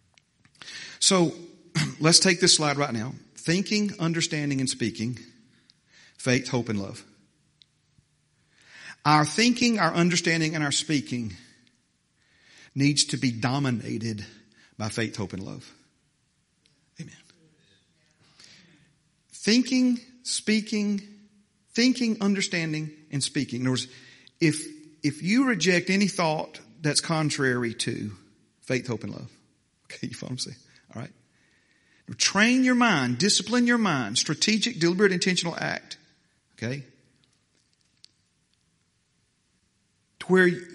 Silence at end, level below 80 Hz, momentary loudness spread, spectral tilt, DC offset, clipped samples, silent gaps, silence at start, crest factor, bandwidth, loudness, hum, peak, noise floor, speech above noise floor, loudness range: 0 s; -68 dBFS; 19 LU; -3.5 dB/octave; under 0.1%; under 0.1%; none; 0.65 s; 26 dB; 11.5 kHz; -24 LUFS; none; -2 dBFS; -70 dBFS; 46 dB; 13 LU